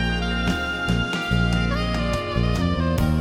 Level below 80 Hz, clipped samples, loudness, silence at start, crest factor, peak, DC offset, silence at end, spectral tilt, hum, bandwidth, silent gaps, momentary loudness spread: -28 dBFS; under 0.1%; -23 LUFS; 0 s; 14 dB; -8 dBFS; under 0.1%; 0 s; -6 dB/octave; none; 16 kHz; none; 2 LU